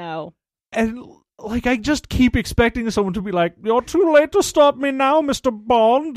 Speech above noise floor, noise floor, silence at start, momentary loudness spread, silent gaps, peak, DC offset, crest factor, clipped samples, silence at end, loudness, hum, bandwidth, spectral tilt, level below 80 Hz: 24 dB; -42 dBFS; 0 s; 12 LU; none; -2 dBFS; under 0.1%; 16 dB; under 0.1%; 0 s; -18 LUFS; none; 15 kHz; -5 dB/octave; -38 dBFS